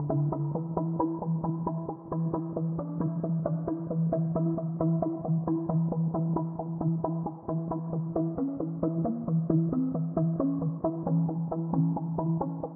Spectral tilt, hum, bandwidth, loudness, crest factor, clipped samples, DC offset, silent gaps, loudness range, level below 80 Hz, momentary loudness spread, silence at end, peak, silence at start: -12 dB/octave; none; 1.7 kHz; -30 LUFS; 16 dB; under 0.1%; under 0.1%; none; 2 LU; -58 dBFS; 4 LU; 0 s; -12 dBFS; 0 s